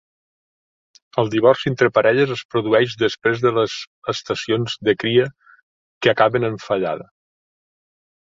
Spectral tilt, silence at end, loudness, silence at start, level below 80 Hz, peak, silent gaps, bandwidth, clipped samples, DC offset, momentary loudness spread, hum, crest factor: -5.5 dB/octave; 1.35 s; -19 LUFS; 1.15 s; -58 dBFS; -2 dBFS; 2.45-2.49 s, 3.87-4.02 s, 5.62-6.01 s; 7.6 kHz; under 0.1%; under 0.1%; 10 LU; none; 20 dB